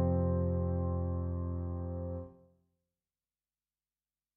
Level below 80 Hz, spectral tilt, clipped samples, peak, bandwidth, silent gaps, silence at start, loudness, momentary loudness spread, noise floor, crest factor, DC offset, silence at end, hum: -48 dBFS; -11 dB/octave; under 0.1%; -20 dBFS; 2 kHz; none; 0 s; -35 LUFS; 10 LU; under -90 dBFS; 16 dB; under 0.1%; 2.05 s; none